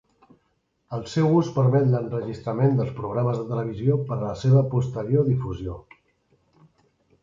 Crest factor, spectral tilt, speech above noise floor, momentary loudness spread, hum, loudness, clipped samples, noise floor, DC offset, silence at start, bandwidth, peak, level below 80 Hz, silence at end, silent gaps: 16 dB; -9 dB/octave; 48 dB; 12 LU; none; -23 LUFS; under 0.1%; -71 dBFS; under 0.1%; 0.9 s; 7.6 kHz; -8 dBFS; -50 dBFS; 1.4 s; none